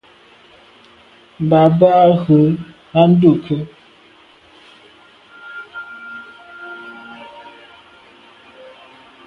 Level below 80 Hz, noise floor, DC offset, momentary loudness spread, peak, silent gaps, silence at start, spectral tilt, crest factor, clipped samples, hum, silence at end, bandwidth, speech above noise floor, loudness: -54 dBFS; -48 dBFS; under 0.1%; 25 LU; 0 dBFS; none; 1.4 s; -10 dB/octave; 18 dB; under 0.1%; none; 1.85 s; 5 kHz; 36 dB; -13 LUFS